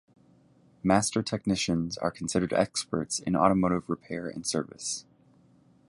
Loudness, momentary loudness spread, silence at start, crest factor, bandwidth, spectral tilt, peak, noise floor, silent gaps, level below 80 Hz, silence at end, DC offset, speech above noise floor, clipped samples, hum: -28 LUFS; 10 LU; 0.85 s; 22 dB; 11.5 kHz; -4.5 dB/octave; -6 dBFS; -61 dBFS; none; -56 dBFS; 0.85 s; under 0.1%; 33 dB; under 0.1%; none